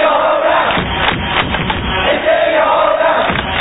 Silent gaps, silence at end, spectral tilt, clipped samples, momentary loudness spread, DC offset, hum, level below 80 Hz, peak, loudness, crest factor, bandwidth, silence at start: none; 0 s; -8 dB/octave; under 0.1%; 3 LU; 0.2%; none; -30 dBFS; 0 dBFS; -13 LUFS; 12 dB; 4 kHz; 0 s